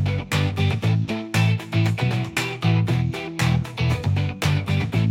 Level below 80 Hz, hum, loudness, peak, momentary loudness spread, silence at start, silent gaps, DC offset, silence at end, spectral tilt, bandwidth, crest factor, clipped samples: -46 dBFS; none; -22 LUFS; -8 dBFS; 3 LU; 0 s; none; under 0.1%; 0 s; -6 dB/octave; 16 kHz; 14 dB; under 0.1%